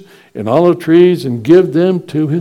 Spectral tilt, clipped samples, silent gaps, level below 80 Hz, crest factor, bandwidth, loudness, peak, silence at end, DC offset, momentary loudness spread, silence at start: -8.5 dB/octave; 0.8%; none; -56 dBFS; 12 dB; 12 kHz; -11 LUFS; 0 dBFS; 0 s; under 0.1%; 8 LU; 0.35 s